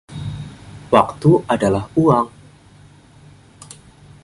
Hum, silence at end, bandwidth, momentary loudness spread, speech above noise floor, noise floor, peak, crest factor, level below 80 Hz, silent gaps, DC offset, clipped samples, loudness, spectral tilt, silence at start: none; 1.95 s; 11.5 kHz; 24 LU; 31 dB; -46 dBFS; 0 dBFS; 20 dB; -46 dBFS; none; under 0.1%; under 0.1%; -17 LUFS; -7.5 dB/octave; 0.1 s